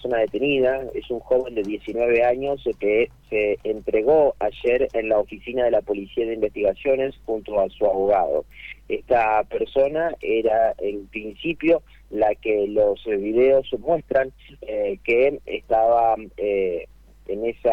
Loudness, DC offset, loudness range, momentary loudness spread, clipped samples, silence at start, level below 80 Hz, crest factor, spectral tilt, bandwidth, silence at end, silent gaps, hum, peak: -22 LUFS; under 0.1%; 2 LU; 10 LU; under 0.1%; 0 s; -48 dBFS; 14 dB; -7 dB/octave; 5.6 kHz; 0 s; none; none; -8 dBFS